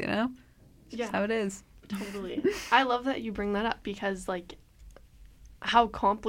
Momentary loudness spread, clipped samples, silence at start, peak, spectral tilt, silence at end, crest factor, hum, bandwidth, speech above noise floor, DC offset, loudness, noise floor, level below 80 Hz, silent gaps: 13 LU; under 0.1%; 0 s; -8 dBFS; -4.5 dB/octave; 0 s; 22 dB; none; 16.5 kHz; 24 dB; under 0.1%; -30 LUFS; -53 dBFS; -54 dBFS; none